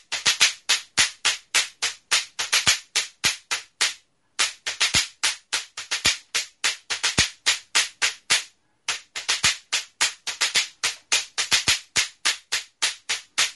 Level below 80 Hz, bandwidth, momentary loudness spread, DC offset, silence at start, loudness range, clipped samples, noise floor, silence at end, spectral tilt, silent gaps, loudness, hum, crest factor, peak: -54 dBFS; 12 kHz; 9 LU; under 0.1%; 0.1 s; 2 LU; under 0.1%; -43 dBFS; 0 s; 1 dB/octave; none; -22 LUFS; none; 24 dB; 0 dBFS